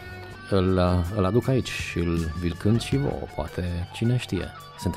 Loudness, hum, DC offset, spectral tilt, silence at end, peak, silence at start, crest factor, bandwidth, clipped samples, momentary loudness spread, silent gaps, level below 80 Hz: -26 LUFS; none; under 0.1%; -6.5 dB/octave; 0 s; -10 dBFS; 0 s; 16 dB; 15.5 kHz; under 0.1%; 10 LU; none; -40 dBFS